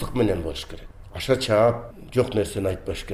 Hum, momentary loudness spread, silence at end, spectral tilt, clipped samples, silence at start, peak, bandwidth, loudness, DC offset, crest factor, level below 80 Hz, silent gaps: none; 16 LU; 0 s; -6 dB/octave; under 0.1%; 0 s; -8 dBFS; 15.5 kHz; -24 LUFS; under 0.1%; 16 dB; -40 dBFS; none